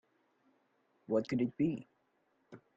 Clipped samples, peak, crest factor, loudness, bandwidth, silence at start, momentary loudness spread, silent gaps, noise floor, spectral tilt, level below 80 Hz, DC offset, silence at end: under 0.1%; -20 dBFS; 20 dB; -36 LUFS; 7.8 kHz; 1.1 s; 4 LU; none; -77 dBFS; -8.5 dB/octave; -74 dBFS; under 0.1%; 0.2 s